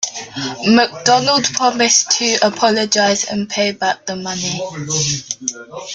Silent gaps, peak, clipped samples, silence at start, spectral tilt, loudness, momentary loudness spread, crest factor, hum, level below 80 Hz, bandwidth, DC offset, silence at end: none; 0 dBFS; under 0.1%; 0 s; -2.5 dB/octave; -15 LUFS; 11 LU; 16 dB; none; -56 dBFS; 11 kHz; under 0.1%; 0 s